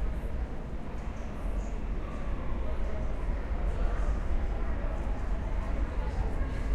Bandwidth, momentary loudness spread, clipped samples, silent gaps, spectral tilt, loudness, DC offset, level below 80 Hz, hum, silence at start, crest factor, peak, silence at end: 8 kHz; 5 LU; under 0.1%; none; -7.5 dB/octave; -36 LUFS; under 0.1%; -32 dBFS; none; 0 s; 14 dB; -16 dBFS; 0 s